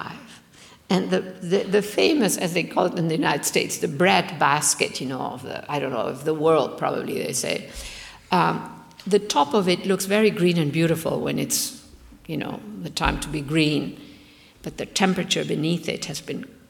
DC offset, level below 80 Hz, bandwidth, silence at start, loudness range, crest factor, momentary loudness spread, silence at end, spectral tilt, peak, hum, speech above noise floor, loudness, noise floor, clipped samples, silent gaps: under 0.1%; -48 dBFS; 18.5 kHz; 0 s; 4 LU; 22 dB; 14 LU; 0.2 s; -4 dB/octave; -2 dBFS; none; 27 dB; -23 LUFS; -50 dBFS; under 0.1%; none